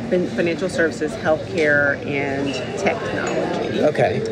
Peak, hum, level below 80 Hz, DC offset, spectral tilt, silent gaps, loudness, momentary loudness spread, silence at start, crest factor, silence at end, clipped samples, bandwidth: -6 dBFS; none; -50 dBFS; under 0.1%; -5.5 dB/octave; none; -20 LUFS; 5 LU; 0 s; 14 dB; 0 s; under 0.1%; 11.5 kHz